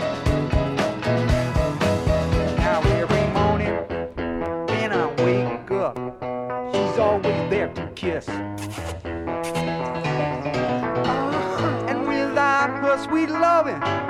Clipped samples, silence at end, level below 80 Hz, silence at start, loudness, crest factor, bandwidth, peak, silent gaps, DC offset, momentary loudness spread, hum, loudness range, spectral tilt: under 0.1%; 0 s; -34 dBFS; 0 s; -23 LUFS; 16 dB; 14.5 kHz; -6 dBFS; none; under 0.1%; 9 LU; none; 4 LU; -6.5 dB/octave